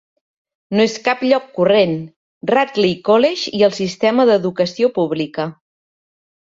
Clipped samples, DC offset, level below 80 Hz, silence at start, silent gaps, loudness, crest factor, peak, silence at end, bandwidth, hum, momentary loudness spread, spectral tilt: under 0.1%; under 0.1%; -60 dBFS; 0.7 s; 2.16-2.41 s; -16 LUFS; 16 dB; -2 dBFS; 1.05 s; 7.8 kHz; none; 8 LU; -5.5 dB/octave